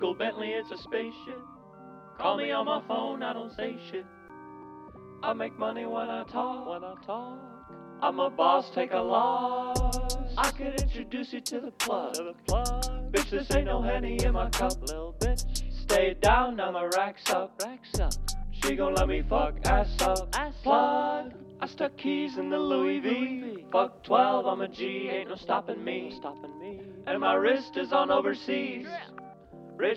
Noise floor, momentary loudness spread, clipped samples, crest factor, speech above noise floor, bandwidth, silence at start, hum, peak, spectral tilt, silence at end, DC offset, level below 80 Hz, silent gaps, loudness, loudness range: -49 dBFS; 17 LU; under 0.1%; 22 dB; 20 dB; 14.5 kHz; 0 s; none; -8 dBFS; -4.5 dB/octave; 0 s; under 0.1%; -36 dBFS; none; -29 LUFS; 6 LU